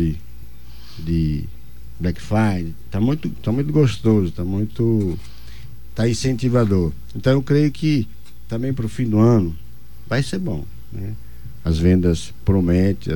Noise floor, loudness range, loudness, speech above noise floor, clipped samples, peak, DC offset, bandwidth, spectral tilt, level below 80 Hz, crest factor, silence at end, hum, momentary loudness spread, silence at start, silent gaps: -41 dBFS; 3 LU; -20 LUFS; 22 dB; under 0.1%; -4 dBFS; 3%; 17 kHz; -7.5 dB/octave; -36 dBFS; 16 dB; 0 s; none; 16 LU; 0 s; none